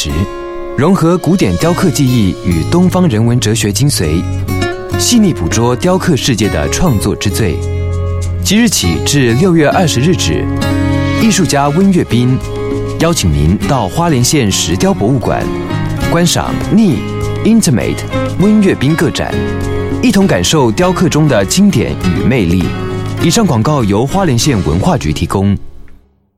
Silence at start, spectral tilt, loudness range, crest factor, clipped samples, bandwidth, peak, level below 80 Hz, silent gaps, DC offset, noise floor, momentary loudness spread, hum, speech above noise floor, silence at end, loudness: 0 s; -5 dB/octave; 2 LU; 10 dB; under 0.1%; 16 kHz; 0 dBFS; -26 dBFS; none; under 0.1%; -38 dBFS; 7 LU; none; 28 dB; 0.45 s; -11 LUFS